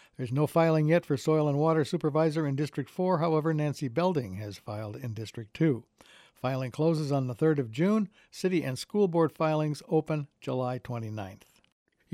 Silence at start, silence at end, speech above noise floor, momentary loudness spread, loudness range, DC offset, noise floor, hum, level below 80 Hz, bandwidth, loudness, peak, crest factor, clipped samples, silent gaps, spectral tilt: 0.2 s; 0.8 s; 29 dB; 12 LU; 5 LU; under 0.1%; -58 dBFS; none; -70 dBFS; 14.5 kHz; -29 LUFS; -12 dBFS; 16 dB; under 0.1%; none; -7.5 dB/octave